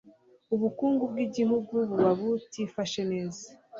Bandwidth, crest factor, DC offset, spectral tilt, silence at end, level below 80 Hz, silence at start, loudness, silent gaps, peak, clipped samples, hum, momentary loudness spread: 7.8 kHz; 16 dB; under 0.1%; -6 dB/octave; 0 s; -70 dBFS; 0.05 s; -29 LUFS; none; -12 dBFS; under 0.1%; none; 9 LU